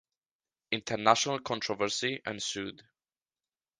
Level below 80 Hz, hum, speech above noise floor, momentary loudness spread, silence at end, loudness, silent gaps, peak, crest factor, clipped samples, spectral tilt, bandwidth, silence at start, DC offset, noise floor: -70 dBFS; none; over 59 dB; 10 LU; 1 s; -31 LUFS; none; -6 dBFS; 28 dB; under 0.1%; -2.5 dB/octave; 10.5 kHz; 0.7 s; under 0.1%; under -90 dBFS